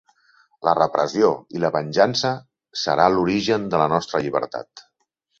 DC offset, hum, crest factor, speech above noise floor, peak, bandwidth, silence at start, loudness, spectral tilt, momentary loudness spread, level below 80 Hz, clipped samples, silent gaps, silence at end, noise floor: under 0.1%; none; 20 dB; 51 dB; -2 dBFS; 7.8 kHz; 0.6 s; -21 LUFS; -5 dB/octave; 9 LU; -58 dBFS; under 0.1%; none; 0.6 s; -71 dBFS